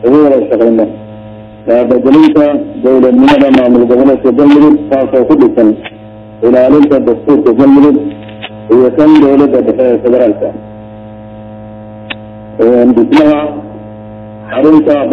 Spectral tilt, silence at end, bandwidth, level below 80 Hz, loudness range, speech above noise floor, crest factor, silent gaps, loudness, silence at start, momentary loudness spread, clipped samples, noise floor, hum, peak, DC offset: -8 dB/octave; 0 s; 6 kHz; -42 dBFS; 5 LU; 23 dB; 8 dB; none; -7 LUFS; 0 s; 22 LU; 2%; -28 dBFS; none; 0 dBFS; under 0.1%